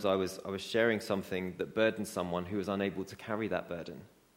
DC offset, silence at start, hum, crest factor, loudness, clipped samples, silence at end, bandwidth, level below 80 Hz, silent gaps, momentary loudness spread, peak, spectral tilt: under 0.1%; 0 s; none; 20 dB; -34 LUFS; under 0.1%; 0.3 s; 16.5 kHz; -68 dBFS; none; 12 LU; -14 dBFS; -5.5 dB/octave